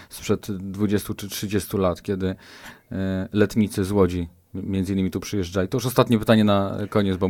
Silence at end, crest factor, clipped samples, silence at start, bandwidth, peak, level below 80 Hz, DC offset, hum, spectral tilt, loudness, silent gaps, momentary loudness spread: 0 s; 20 dB; under 0.1%; 0 s; 18 kHz; -2 dBFS; -48 dBFS; under 0.1%; none; -6 dB/octave; -23 LUFS; none; 12 LU